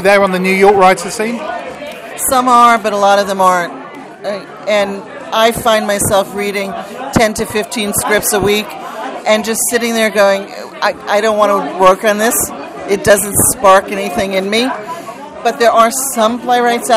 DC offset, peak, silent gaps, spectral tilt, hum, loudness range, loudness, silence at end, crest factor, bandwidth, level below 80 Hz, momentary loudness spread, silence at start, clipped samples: under 0.1%; 0 dBFS; none; -3 dB/octave; none; 3 LU; -12 LUFS; 0 s; 12 dB; 16.5 kHz; -44 dBFS; 14 LU; 0 s; 0.3%